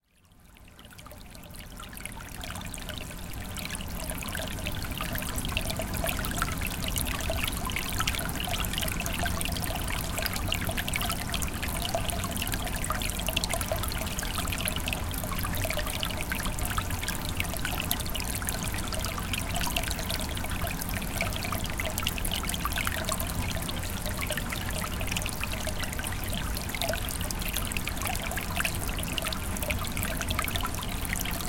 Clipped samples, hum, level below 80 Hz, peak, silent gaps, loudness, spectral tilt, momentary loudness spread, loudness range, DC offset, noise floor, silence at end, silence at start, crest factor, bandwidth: under 0.1%; none; -38 dBFS; -4 dBFS; none; -31 LUFS; -3 dB/octave; 6 LU; 4 LU; under 0.1%; -58 dBFS; 0 s; 0.45 s; 26 dB; 17 kHz